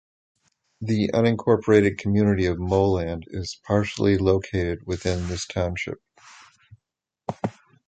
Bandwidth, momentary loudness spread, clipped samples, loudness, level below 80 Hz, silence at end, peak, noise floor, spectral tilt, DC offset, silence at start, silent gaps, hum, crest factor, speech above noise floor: 9 kHz; 14 LU; under 0.1%; -23 LUFS; -42 dBFS; 0.35 s; -2 dBFS; -81 dBFS; -6.5 dB/octave; under 0.1%; 0.8 s; none; none; 20 dB; 59 dB